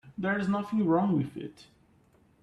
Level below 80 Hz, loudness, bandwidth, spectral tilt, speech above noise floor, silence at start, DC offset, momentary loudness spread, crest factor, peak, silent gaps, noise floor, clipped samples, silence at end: -66 dBFS; -29 LUFS; 9.8 kHz; -8.5 dB/octave; 35 dB; 0.05 s; under 0.1%; 15 LU; 16 dB; -14 dBFS; none; -63 dBFS; under 0.1%; 0.8 s